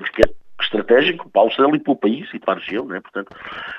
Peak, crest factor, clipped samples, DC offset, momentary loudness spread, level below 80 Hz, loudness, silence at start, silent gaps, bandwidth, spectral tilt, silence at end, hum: 0 dBFS; 18 dB; under 0.1%; under 0.1%; 14 LU; -40 dBFS; -18 LUFS; 0 s; none; 10 kHz; -6 dB/octave; 0 s; none